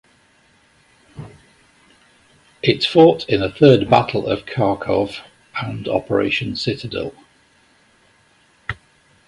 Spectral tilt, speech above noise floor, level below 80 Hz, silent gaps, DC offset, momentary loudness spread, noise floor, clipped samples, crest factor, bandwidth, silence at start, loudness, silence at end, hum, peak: -7 dB/octave; 39 dB; -48 dBFS; none; under 0.1%; 19 LU; -56 dBFS; under 0.1%; 20 dB; 11.5 kHz; 1.15 s; -18 LUFS; 0.55 s; none; 0 dBFS